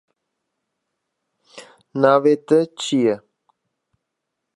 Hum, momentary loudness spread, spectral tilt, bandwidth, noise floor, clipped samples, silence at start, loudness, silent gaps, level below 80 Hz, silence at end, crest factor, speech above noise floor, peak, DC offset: none; 11 LU; -5.5 dB/octave; 11.5 kHz; -79 dBFS; under 0.1%; 1.55 s; -18 LUFS; none; -76 dBFS; 1.4 s; 22 dB; 63 dB; -2 dBFS; under 0.1%